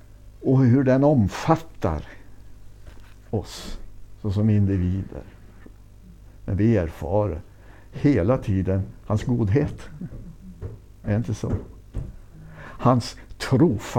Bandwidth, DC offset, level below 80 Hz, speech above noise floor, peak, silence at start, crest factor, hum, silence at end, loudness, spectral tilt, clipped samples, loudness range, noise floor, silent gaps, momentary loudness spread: 14 kHz; under 0.1%; -42 dBFS; 24 dB; -4 dBFS; 0.1 s; 20 dB; none; 0 s; -23 LUFS; -8 dB/octave; under 0.1%; 5 LU; -46 dBFS; none; 20 LU